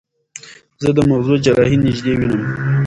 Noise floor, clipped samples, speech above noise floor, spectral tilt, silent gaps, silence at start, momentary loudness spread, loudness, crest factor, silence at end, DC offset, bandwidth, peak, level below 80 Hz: -39 dBFS; under 0.1%; 25 dB; -7 dB/octave; none; 0.35 s; 19 LU; -15 LUFS; 16 dB; 0 s; under 0.1%; 11 kHz; 0 dBFS; -40 dBFS